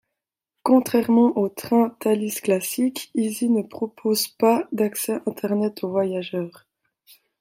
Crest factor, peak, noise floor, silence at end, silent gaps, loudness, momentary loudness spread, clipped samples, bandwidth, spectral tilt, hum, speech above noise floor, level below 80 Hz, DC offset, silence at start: 18 dB; -4 dBFS; -84 dBFS; 0.9 s; none; -22 LUFS; 9 LU; under 0.1%; 16.5 kHz; -5 dB/octave; none; 63 dB; -70 dBFS; under 0.1%; 0.65 s